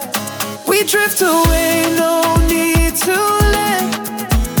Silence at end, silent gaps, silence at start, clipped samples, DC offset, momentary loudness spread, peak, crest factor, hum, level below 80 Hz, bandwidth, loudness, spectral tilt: 0 s; none; 0 s; under 0.1%; under 0.1%; 7 LU; -2 dBFS; 14 dB; none; -22 dBFS; over 20 kHz; -14 LUFS; -4 dB/octave